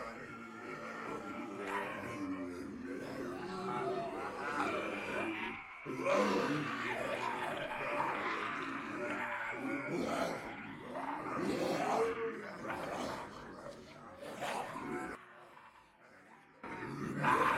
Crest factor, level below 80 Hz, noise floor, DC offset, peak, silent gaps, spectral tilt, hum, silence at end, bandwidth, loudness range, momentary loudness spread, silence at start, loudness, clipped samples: 20 dB; -70 dBFS; -61 dBFS; under 0.1%; -18 dBFS; none; -5 dB/octave; none; 0 s; 16 kHz; 7 LU; 14 LU; 0 s; -39 LUFS; under 0.1%